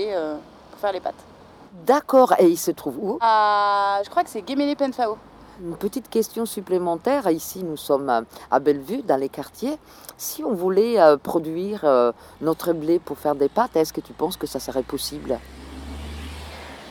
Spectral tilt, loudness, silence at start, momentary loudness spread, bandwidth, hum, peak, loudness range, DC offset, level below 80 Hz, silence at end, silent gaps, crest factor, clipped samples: -5 dB/octave; -22 LUFS; 0 s; 18 LU; over 20 kHz; none; -2 dBFS; 5 LU; under 0.1%; -48 dBFS; 0 s; none; 20 dB; under 0.1%